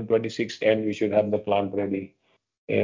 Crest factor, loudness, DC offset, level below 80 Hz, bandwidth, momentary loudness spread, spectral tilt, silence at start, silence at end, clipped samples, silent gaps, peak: 18 dB; -25 LUFS; under 0.1%; -60 dBFS; 7.6 kHz; 7 LU; -6.5 dB/octave; 0 s; 0 s; under 0.1%; 2.58-2.68 s; -8 dBFS